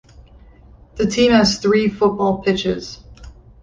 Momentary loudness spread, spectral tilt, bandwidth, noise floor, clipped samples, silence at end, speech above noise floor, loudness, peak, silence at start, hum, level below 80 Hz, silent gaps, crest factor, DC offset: 19 LU; -5 dB/octave; 9.6 kHz; -45 dBFS; under 0.1%; 0.3 s; 29 dB; -17 LUFS; -4 dBFS; 0.95 s; none; -42 dBFS; none; 16 dB; under 0.1%